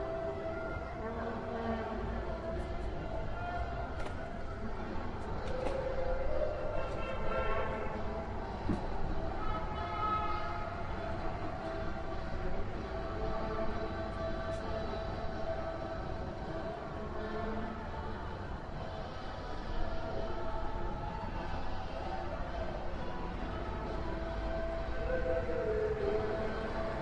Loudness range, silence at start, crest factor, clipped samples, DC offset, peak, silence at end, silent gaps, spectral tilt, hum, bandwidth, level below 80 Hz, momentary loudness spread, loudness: 4 LU; 0 s; 16 dB; under 0.1%; under 0.1%; -20 dBFS; 0 s; none; -7 dB/octave; none; 7.8 kHz; -42 dBFS; 7 LU; -39 LUFS